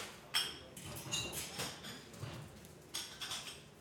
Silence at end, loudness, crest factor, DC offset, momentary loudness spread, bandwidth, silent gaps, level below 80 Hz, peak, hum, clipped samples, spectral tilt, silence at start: 0 s; -42 LUFS; 24 dB; under 0.1%; 13 LU; 17.5 kHz; none; -66 dBFS; -20 dBFS; none; under 0.1%; -1.5 dB/octave; 0 s